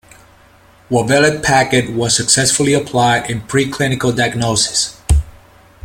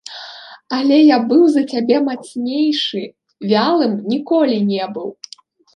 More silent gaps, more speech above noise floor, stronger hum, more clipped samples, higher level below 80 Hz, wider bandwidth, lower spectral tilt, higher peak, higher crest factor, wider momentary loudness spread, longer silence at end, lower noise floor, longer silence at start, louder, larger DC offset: neither; first, 32 dB vs 21 dB; neither; neither; first, -28 dBFS vs -68 dBFS; first, 16.5 kHz vs 10 kHz; second, -3.5 dB/octave vs -6 dB/octave; about the same, 0 dBFS vs -2 dBFS; about the same, 16 dB vs 16 dB; second, 6 LU vs 20 LU; about the same, 0.55 s vs 0.65 s; first, -46 dBFS vs -36 dBFS; first, 0.9 s vs 0.05 s; about the same, -14 LUFS vs -16 LUFS; neither